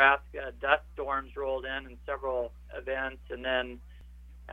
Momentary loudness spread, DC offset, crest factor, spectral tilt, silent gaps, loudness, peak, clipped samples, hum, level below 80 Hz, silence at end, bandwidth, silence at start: 20 LU; under 0.1%; 24 dB; -5.5 dB/octave; none; -32 LUFS; -6 dBFS; under 0.1%; none; -48 dBFS; 0 s; 8.2 kHz; 0 s